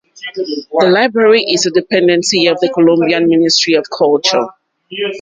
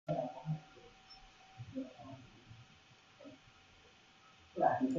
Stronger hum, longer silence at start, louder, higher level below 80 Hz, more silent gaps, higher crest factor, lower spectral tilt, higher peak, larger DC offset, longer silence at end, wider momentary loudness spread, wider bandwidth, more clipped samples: neither; about the same, 0.2 s vs 0.1 s; first, -12 LUFS vs -41 LUFS; first, -58 dBFS vs -74 dBFS; neither; second, 12 dB vs 24 dB; second, -3.5 dB/octave vs -6 dB/octave; first, 0 dBFS vs -18 dBFS; neither; about the same, 0 s vs 0 s; second, 11 LU vs 25 LU; first, 9.4 kHz vs 7.4 kHz; neither